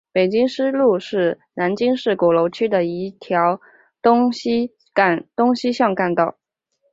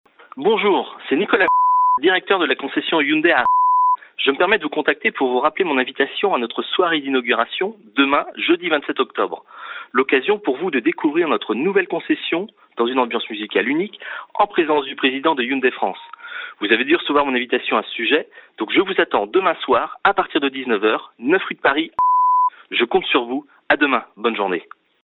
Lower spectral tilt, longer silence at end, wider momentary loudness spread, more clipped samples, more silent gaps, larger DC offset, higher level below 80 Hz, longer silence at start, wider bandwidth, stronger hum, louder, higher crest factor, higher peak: second, -6.5 dB/octave vs -8 dB/octave; first, 0.6 s vs 0.4 s; about the same, 6 LU vs 8 LU; neither; neither; neither; about the same, -62 dBFS vs -62 dBFS; second, 0.15 s vs 0.35 s; first, 7.8 kHz vs 4.2 kHz; neither; about the same, -19 LUFS vs -18 LUFS; about the same, 18 dB vs 18 dB; about the same, -2 dBFS vs 0 dBFS